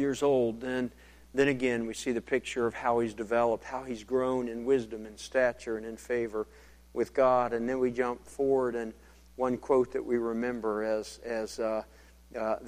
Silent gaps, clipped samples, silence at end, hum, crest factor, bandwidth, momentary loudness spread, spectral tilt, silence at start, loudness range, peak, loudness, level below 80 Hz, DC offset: none; under 0.1%; 0 s; none; 18 dB; 15 kHz; 11 LU; -5.5 dB/octave; 0 s; 2 LU; -12 dBFS; -31 LUFS; -58 dBFS; under 0.1%